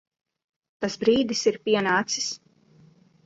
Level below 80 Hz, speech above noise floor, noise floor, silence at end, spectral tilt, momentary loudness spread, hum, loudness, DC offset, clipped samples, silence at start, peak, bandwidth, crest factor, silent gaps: -64 dBFS; 33 dB; -56 dBFS; 0.9 s; -3 dB/octave; 10 LU; none; -24 LUFS; under 0.1%; under 0.1%; 0.8 s; -8 dBFS; 8 kHz; 18 dB; none